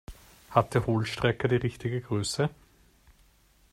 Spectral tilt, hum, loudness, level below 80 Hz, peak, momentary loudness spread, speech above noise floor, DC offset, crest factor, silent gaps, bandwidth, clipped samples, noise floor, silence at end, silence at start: -5.5 dB/octave; none; -28 LUFS; -54 dBFS; -6 dBFS; 6 LU; 35 dB; under 0.1%; 24 dB; none; 14.5 kHz; under 0.1%; -62 dBFS; 1.2 s; 0.1 s